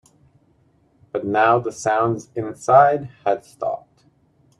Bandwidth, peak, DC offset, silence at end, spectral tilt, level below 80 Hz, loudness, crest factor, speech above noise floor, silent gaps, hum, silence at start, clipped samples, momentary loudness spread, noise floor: 11 kHz; 0 dBFS; under 0.1%; 0.8 s; -6 dB/octave; -64 dBFS; -20 LUFS; 20 dB; 40 dB; none; none; 1.15 s; under 0.1%; 14 LU; -59 dBFS